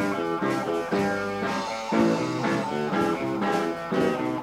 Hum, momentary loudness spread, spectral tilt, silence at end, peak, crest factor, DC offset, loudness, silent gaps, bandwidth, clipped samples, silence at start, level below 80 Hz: none; 4 LU; -6 dB/octave; 0 s; -10 dBFS; 16 dB; under 0.1%; -26 LUFS; none; 16 kHz; under 0.1%; 0 s; -58 dBFS